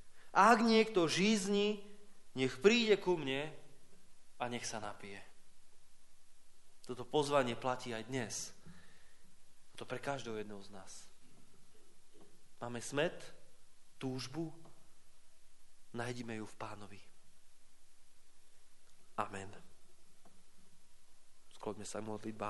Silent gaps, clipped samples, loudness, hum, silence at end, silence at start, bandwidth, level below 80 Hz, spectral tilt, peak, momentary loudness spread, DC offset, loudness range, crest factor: none; under 0.1%; -36 LUFS; none; 0 s; 0 s; 11.5 kHz; -66 dBFS; -4 dB/octave; -12 dBFS; 23 LU; under 0.1%; 17 LU; 26 dB